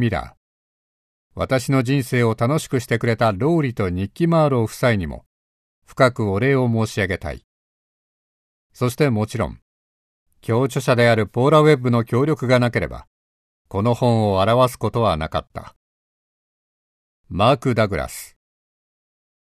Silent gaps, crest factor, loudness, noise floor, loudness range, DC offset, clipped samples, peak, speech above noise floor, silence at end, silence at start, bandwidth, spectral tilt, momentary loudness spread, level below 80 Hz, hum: 0.37-1.30 s, 5.26-5.82 s, 7.44-8.70 s, 9.62-10.26 s, 13.07-13.65 s, 15.76-17.24 s; 18 dB; -19 LUFS; under -90 dBFS; 6 LU; under 0.1%; under 0.1%; -2 dBFS; over 71 dB; 1.2 s; 0 s; 14 kHz; -6.5 dB/octave; 13 LU; -44 dBFS; none